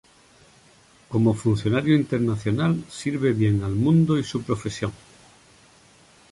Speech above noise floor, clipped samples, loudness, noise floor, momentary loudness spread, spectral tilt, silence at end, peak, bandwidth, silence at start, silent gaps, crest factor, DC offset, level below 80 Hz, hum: 33 dB; under 0.1%; -23 LUFS; -55 dBFS; 9 LU; -7.5 dB/octave; 1.35 s; -6 dBFS; 11.5 kHz; 1.1 s; none; 18 dB; under 0.1%; -50 dBFS; none